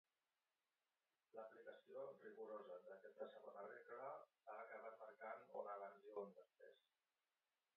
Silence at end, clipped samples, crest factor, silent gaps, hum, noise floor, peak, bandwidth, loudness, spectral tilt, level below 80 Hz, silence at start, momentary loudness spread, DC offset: 1 s; under 0.1%; 20 dB; none; none; under -90 dBFS; -40 dBFS; 4.2 kHz; -58 LUFS; -3.5 dB/octave; under -90 dBFS; 1.35 s; 6 LU; under 0.1%